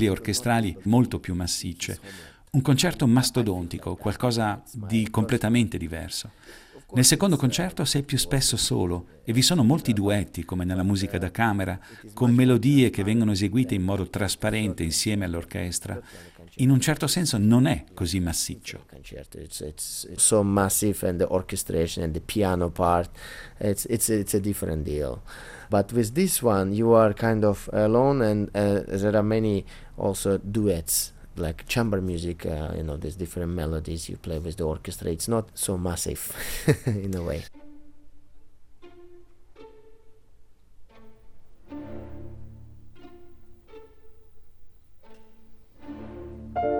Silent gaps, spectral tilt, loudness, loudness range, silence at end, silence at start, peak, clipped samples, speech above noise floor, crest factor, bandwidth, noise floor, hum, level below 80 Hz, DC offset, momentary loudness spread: none; -5 dB/octave; -25 LUFS; 7 LU; 0 s; 0 s; -4 dBFS; under 0.1%; 24 dB; 22 dB; 17.5 kHz; -49 dBFS; none; -46 dBFS; under 0.1%; 16 LU